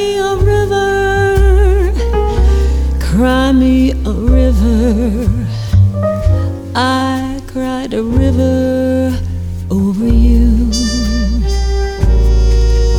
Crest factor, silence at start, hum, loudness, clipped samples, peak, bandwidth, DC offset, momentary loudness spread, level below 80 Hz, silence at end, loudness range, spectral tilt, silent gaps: 12 dB; 0 s; none; -13 LUFS; under 0.1%; 0 dBFS; 12.5 kHz; under 0.1%; 7 LU; -14 dBFS; 0 s; 3 LU; -6.5 dB/octave; none